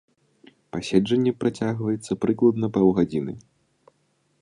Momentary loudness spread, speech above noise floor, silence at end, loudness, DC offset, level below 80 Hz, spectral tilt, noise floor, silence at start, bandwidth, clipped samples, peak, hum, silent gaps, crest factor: 13 LU; 46 dB; 1 s; -23 LUFS; under 0.1%; -56 dBFS; -7 dB/octave; -68 dBFS; 0.75 s; 10.5 kHz; under 0.1%; -4 dBFS; none; none; 20 dB